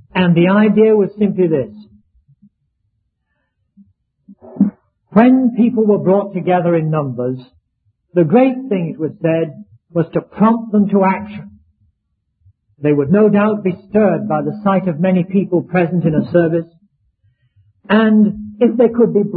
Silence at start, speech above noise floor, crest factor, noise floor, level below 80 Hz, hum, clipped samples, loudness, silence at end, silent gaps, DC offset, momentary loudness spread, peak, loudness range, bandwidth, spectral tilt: 0.15 s; 56 dB; 16 dB; -69 dBFS; -54 dBFS; none; under 0.1%; -14 LUFS; 0 s; none; under 0.1%; 10 LU; 0 dBFS; 3 LU; 4.3 kHz; -12 dB/octave